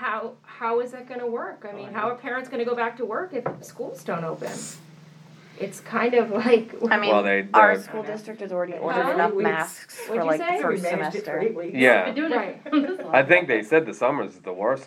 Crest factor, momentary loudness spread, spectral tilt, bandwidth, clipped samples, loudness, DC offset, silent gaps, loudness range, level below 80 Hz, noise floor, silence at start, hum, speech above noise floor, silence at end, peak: 22 dB; 16 LU; -5 dB/octave; 16 kHz; under 0.1%; -23 LUFS; under 0.1%; none; 8 LU; -84 dBFS; -48 dBFS; 0 s; none; 24 dB; 0 s; -2 dBFS